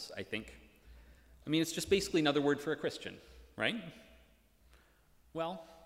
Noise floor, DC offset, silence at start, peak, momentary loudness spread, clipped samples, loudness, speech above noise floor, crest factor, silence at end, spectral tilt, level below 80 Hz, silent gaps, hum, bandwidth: -67 dBFS; under 0.1%; 0 s; -16 dBFS; 21 LU; under 0.1%; -35 LUFS; 31 dB; 20 dB; 0.05 s; -4 dB/octave; -62 dBFS; none; none; 16 kHz